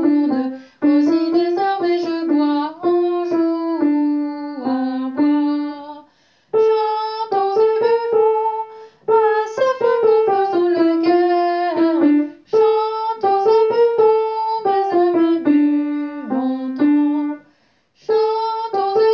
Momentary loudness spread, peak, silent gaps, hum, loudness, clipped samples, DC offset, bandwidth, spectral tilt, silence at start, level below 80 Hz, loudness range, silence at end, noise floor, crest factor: 8 LU; -4 dBFS; none; none; -17 LUFS; under 0.1%; under 0.1%; 6.8 kHz; -6.5 dB/octave; 0 s; -72 dBFS; 4 LU; 0 s; -59 dBFS; 12 dB